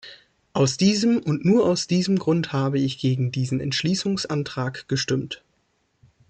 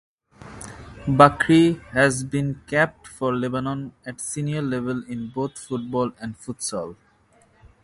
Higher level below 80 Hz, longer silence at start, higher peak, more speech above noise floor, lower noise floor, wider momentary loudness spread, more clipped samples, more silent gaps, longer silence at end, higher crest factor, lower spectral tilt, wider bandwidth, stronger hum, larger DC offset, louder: second, -58 dBFS vs -52 dBFS; second, 0.05 s vs 0.4 s; second, -8 dBFS vs 0 dBFS; first, 47 dB vs 36 dB; first, -69 dBFS vs -58 dBFS; second, 8 LU vs 18 LU; neither; neither; about the same, 0.95 s vs 0.9 s; second, 16 dB vs 24 dB; about the same, -5.5 dB/octave vs -5.5 dB/octave; second, 9.2 kHz vs 11.5 kHz; neither; neither; about the same, -23 LUFS vs -22 LUFS